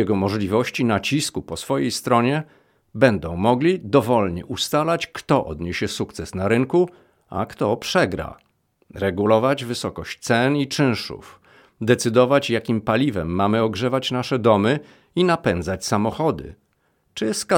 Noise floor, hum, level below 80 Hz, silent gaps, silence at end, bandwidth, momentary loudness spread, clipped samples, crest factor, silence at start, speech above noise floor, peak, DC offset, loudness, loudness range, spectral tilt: -66 dBFS; none; -50 dBFS; none; 0 s; 17.5 kHz; 11 LU; under 0.1%; 20 dB; 0 s; 46 dB; -2 dBFS; under 0.1%; -21 LUFS; 3 LU; -5.5 dB/octave